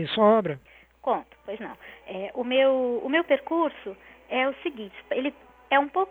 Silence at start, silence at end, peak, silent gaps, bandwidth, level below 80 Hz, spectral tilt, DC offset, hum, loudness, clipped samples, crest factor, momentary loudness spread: 0 s; 0 s; -8 dBFS; none; 4.4 kHz; -64 dBFS; -7.5 dB/octave; under 0.1%; none; -25 LUFS; under 0.1%; 18 dB; 18 LU